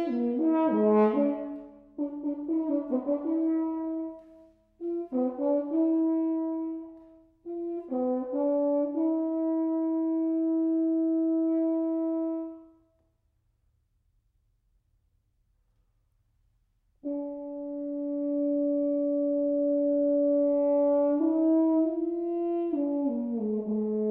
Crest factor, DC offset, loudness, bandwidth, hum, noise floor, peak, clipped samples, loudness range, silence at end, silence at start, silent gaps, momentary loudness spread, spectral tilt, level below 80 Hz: 14 dB; under 0.1%; -28 LUFS; 3.4 kHz; none; -72 dBFS; -14 dBFS; under 0.1%; 10 LU; 0 s; 0 s; none; 12 LU; -11 dB/octave; -70 dBFS